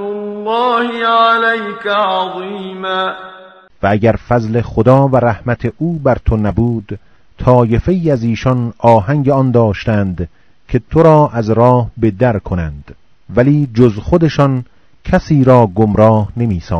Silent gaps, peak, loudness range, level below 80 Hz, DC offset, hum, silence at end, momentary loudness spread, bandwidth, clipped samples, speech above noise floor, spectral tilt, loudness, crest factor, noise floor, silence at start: none; 0 dBFS; 3 LU; -32 dBFS; 0.5%; none; 0 s; 11 LU; 6.6 kHz; 0.6%; 27 dB; -8.5 dB/octave; -13 LUFS; 12 dB; -39 dBFS; 0 s